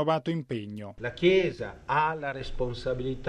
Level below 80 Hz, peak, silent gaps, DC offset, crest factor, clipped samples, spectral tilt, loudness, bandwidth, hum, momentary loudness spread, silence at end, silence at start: -44 dBFS; -10 dBFS; none; under 0.1%; 20 dB; under 0.1%; -7 dB/octave; -29 LUFS; 9.6 kHz; none; 13 LU; 0 s; 0 s